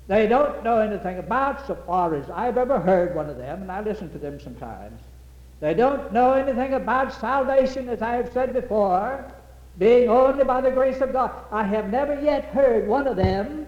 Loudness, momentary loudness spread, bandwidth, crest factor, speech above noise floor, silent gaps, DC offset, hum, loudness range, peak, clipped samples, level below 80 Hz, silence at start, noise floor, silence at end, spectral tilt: -22 LUFS; 13 LU; 9 kHz; 14 dB; 23 dB; none; under 0.1%; none; 5 LU; -8 dBFS; under 0.1%; -44 dBFS; 0 s; -45 dBFS; 0 s; -7.5 dB/octave